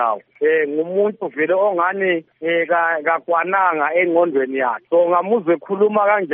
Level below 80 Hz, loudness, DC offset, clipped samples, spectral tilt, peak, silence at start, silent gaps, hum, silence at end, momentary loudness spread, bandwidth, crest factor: -78 dBFS; -18 LUFS; under 0.1%; under 0.1%; -3.5 dB/octave; -4 dBFS; 0 s; none; none; 0 s; 5 LU; 3.7 kHz; 14 dB